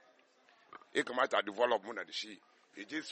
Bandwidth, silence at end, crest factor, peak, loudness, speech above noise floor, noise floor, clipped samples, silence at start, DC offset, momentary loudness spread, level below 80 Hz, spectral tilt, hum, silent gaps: 8.4 kHz; 0 s; 22 dB; -16 dBFS; -35 LUFS; 32 dB; -67 dBFS; under 0.1%; 0.7 s; under 0.1%; 24 LU; -88 dBFS; -2.5 dB/octave; none; none